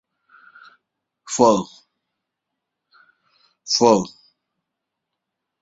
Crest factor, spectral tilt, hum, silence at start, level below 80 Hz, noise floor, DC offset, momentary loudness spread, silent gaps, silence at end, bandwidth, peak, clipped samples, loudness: 24 dB; -4 dB/octave; none; 1.25 s; -62 dBFS; -81 dBFS; under 0.1%; 20 LU; none; 1.55 s; 8 kHz; -2 dBFS; under 0.1%; -18 LUFS